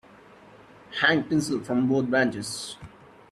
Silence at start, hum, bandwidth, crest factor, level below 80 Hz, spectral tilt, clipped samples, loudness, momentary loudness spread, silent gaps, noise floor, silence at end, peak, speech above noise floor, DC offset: 0.9 s; none; 13 kHz; 22 dB; -62 dBFS; -4.5 dB/octave; under 0.1%; -25 LUFS; 14 LU; none; -51 dBFS; 0.45 s; -6 dBFS; 26 dB; under 0.1%